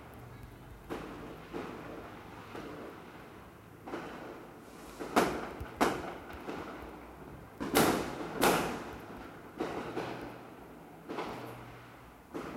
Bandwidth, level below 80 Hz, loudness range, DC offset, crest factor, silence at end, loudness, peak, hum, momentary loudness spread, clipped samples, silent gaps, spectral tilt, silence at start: 16 kHz; -58 dBFS; 12 LU; under 0.1%; 28 dB; 0 s; -36 LUFS; -10 dBFS; none; 20 LU; under 0.1%; none; -4 dB/octave; 0 s